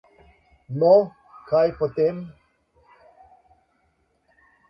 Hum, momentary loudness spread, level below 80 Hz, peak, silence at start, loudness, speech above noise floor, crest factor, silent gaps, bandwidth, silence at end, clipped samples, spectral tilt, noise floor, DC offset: none; 18 LU; -60 dBFS; -4 dBFS; 0.7 s; -21 LUFS; 48 dB; 20 dB; none; 5.8 kHz; 2.4 s; under 0.1%; -10 dB/octave; -68 dBFS; under 0.1%